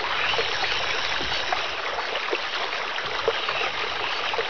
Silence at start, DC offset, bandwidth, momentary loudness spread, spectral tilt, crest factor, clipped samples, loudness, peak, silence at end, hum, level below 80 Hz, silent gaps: 0 s; 1%; 5.4 kHz; 4 LU; -1.5 dB/octave; 18 dB; under 0.1%; -25 LUFS; -8 dBFS; 0 s; none; -52 dBFS; none